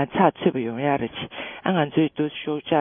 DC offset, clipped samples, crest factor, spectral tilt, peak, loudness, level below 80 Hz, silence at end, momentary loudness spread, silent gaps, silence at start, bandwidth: under 0.1%; under 0.1%; 20 dB; -11 dB/octave; -4 dBFS; -24 LUFS; -60 dBFS; 0 s; 10 LU; none; 0 s; 3.7 kHz